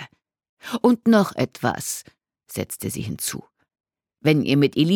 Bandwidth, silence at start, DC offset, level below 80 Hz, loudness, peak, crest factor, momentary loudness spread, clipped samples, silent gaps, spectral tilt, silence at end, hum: 18.5 kHz; 0 s; under 0.1%; -60 dBFS; -22 LUFS; -4 dBFS; 18 dB; 15 LU; under 0.1%; 0.49-0.57 s; -5 dB/octave; 0 s; none